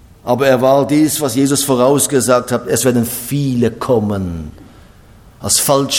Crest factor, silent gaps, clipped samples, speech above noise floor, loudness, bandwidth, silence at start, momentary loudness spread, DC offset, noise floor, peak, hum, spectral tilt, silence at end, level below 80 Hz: 14 dB; none; under 0.1%; 28 dB; -14 LUFS; 19 kHz; 0.25 s; 8 LU; under 0.1%; -42 dBFS; 0 dBFS; none; -4.5 dB/octave; 0 s; -44 dBFS